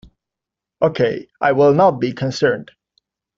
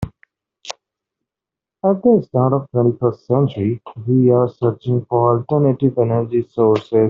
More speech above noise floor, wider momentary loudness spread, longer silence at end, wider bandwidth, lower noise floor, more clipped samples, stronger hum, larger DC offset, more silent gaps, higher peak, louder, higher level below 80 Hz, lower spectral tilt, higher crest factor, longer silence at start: about the same, 69 dB vs 71 dB; second, 9 LU vs 13 LU; first, 0.75 s vs 0 s; about the same, 7.6 kHz vs 7.4 kHz; about the same, -85 dBFS vs -87 dBFS; neither; neither; neither; neither; about the same, -2 dBFS vs -2 dBFS; about the same, -17 LUFS vs -17 LUFS; about the same, -56 dBFS vs -52 dBFS; second, -5 dB/octave vs -9.5 dB/octave; about the same, 16 dB vs 14 dB; first, 0.8 s vs 0 s